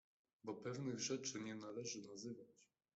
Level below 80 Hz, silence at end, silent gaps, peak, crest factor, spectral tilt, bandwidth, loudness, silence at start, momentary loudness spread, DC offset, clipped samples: -86 dBFS; 0.3 s; none; -32 dBFS; 18 dB; -3.5 dB/octave; 8.2 kHz; -48 LUFS; 0.45 s; 12 LU; under 0.1%; under 0.1%